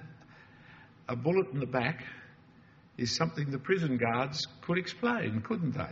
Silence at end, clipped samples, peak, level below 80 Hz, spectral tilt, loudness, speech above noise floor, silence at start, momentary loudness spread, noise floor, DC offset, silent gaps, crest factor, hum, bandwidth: 0 s; under 0.1%; -14 dBFS; -66 dBFS; -4.5 dB/octave; -32 LUFS; 27 dB; 0 s; 14 LU; -59 dBFS; under 0.1%; none; 20 dB; none; 7.6 kHz